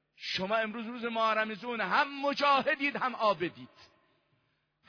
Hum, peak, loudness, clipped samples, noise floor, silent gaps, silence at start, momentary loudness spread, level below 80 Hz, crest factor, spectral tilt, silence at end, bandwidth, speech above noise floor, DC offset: none; -16 dBFS; -30 LUFS; under 0.1%; -76 dBFS; none; 0.2 s; 9 LU; -76 dBFS; 18 dB; -4.5 dB/octave; 1.05 s; 5.4 kHz; 45 dB; under 0.1%